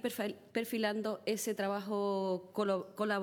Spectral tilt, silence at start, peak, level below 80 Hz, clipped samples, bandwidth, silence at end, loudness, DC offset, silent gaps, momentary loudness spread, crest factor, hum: -4.5 dB/octave; 0 s; -20 dBFS; -84 dBFS; under 0.1%; 19 kHz; 0 s; -36 LUFS; under 0.1%; none; 3 LU; 16 dB; none